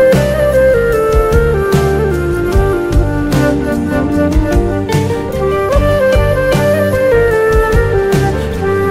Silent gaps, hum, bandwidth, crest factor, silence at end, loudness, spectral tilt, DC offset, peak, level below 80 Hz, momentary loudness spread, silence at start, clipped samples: none; none; 16 kHz; 10 dB; 0 s; -12 LUFS; -7 dB/octave; under 0.1%; 0 dBFS; -18 dBFS; 4 LU; 0 s; under 0.1%